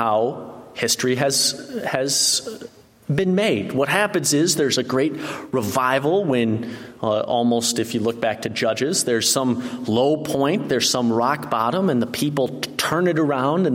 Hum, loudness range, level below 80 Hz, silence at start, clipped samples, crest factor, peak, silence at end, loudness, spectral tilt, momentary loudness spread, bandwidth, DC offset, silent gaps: none; 1 LU; -60 dBFS; 0 s; under 0.1%; 20 dB; -2 dBFS; 0 s; -20 LUFS; -3.5 dB/octave; 8 LU; 16.5 kHz; under 0.1%; none